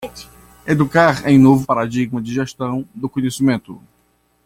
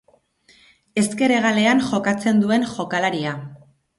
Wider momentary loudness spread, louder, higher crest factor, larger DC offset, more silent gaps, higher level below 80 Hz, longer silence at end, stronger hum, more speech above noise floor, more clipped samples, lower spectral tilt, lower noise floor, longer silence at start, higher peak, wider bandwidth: about the same, 13 LU vs 11 LU; first, -16 LUFS vs -20 LUFS; about the same, 16 dB vs 14 dB; neither; neither; first, -50 dBFS vs -60 dBFS; first, 0.7 s vs 0.4 s; first, 60 Hz at -45 dBFS vs none; first, 44 dB vs 38 dB; neither; first, -6.5 dB/octave vs -5 dB/octave; first, -61 dBFS vs -57 dBFS; second, 0 s vs 0.95 s; first, -2 dBFS vs -6 dBFS; first, 15.5 kHz vs 11.5 kHz